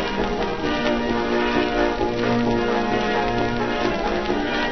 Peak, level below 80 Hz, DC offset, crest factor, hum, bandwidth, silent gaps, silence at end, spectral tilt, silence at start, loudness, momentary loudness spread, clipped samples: -6 dBFS; -36 dBFS; 1%; 14 dB; none; 6.4 kHz; none; 0 s; -5.5 dB/octave; 0 s; -22 LUFS; 3 LU; under 0.1%